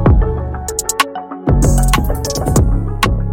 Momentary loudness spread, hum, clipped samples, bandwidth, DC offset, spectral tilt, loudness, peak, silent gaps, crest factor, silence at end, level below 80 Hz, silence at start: 6 LU; none; under 0.1%; 17 kHz; under 0.1%; -5 dB/octave; -16 LUFS; 0 dBFS; none; 14 dB; 0 s; -16 dBFS; 0 s